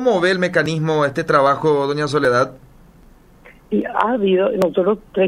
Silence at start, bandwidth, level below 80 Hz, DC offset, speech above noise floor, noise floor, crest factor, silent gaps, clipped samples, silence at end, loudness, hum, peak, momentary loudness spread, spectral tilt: 0 s; 14 kHz; -50 dBFS; under 0.1%; 30 dB; -47 dBFS; 18 dB; none; under 0.1%; 0 s; -17 LUFS; none; 0 dBFS; 4 LU; -6 dB/octave